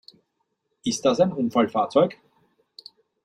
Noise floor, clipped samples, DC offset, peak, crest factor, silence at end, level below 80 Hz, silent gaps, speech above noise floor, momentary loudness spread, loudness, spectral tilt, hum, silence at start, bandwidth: -75 dBFS; under 0.1%; under 0.1%; -6 dBFS; 20 dB; 1.1 s; -66 dBFS; none; 54 dB; 6 LU; -23 LUFS; -5 dB/octave; none; 0.85 s; 12 kHz